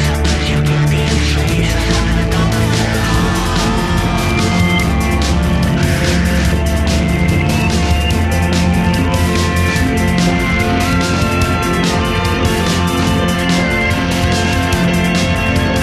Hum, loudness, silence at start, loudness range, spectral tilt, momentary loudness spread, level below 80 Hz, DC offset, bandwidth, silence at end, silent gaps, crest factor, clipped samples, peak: none; -14 LUFS; 0 s; 0 LU; -5 dB/octave; 1 LU; -20 dBFS; under 0.1%; 15 kHz; 0 s; none; 12 dB; under 0.1%; -2 dBFS